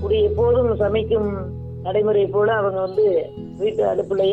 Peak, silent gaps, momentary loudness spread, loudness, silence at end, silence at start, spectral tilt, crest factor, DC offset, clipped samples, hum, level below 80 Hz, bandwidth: -8 dBFS; none; 8 LU; -20 LUFS; 0 s; 0 s; -8.5 dB/octave; 12 dB; under 0.1%; under 0.1%; none; -42 dBFS; 4.6 kHz